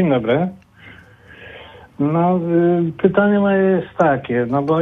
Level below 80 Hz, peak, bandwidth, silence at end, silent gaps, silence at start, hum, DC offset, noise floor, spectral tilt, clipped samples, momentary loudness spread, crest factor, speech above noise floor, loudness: -52 dBFS; -2 dBFS; 6.4 kHz; 0 s; none; 0 s; none; under 0.1%; -43 dBFS; -9.5 dB/octave; under 0.1%; 9 LU; 16 dB; 27 dB; -17 LUFS